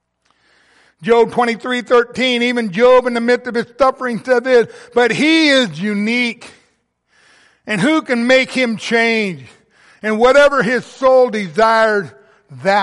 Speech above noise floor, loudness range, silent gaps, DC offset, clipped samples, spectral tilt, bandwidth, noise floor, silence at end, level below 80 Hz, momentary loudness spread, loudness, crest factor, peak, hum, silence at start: 48 dB; 3 LU; none; under 0.1%; under 0.1%; -4.5 dB/octave; 11.5 kHz; -62 dBFS; 0 s; -52 dBFS; 10 LU; -14 LUFS; 14 dB; -2 dBFS; none; 1 s